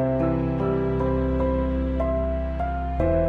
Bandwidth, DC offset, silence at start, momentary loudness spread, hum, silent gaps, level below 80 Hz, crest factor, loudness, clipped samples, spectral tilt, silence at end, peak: 4.5 kHz; under 0.1%; 0 s; 4 LU; none; none; -30 dBFS; 14 dB; -25 LUFS; under 0.1%; -10.5 dB/octave; 0 s; -10 dBFS